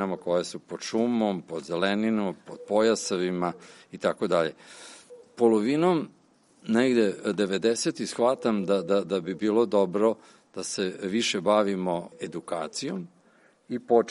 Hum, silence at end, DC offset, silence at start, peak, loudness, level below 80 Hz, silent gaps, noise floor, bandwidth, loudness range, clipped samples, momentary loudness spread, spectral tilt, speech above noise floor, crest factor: none; 0 s; under 0.1%; 0 s; -8 dBFS; -26 LUFS; -72 dBFS; none; -61 dBFS; 11.5 kHz; 3 LU; under 0.1%; 14 LU; -5 dB/octave; 35 dB; 20 dB